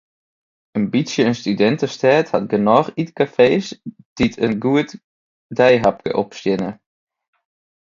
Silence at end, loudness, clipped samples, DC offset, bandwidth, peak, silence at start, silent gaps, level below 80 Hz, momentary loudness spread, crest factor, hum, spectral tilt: 1.2 s; -18 LUFS; under 0.1%; under 0.1%; 7.6 kHz; 0 dBFS; 0.75 s; 4.05-4.16 s, 5.04-5.49 s; -52 dBFS; 13 LU; 18 dB; none; -6 dB/octave